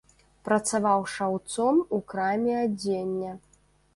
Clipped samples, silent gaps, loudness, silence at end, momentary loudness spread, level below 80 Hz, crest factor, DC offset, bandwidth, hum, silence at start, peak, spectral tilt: under 0.1%; none; -27 LUFS; 0.55 s; 9 LU; -64 dBFS; 16 dB; under 0.1%; 11.5 kHz; none; 0.45 s; -10 dBFS; -5 dB/octave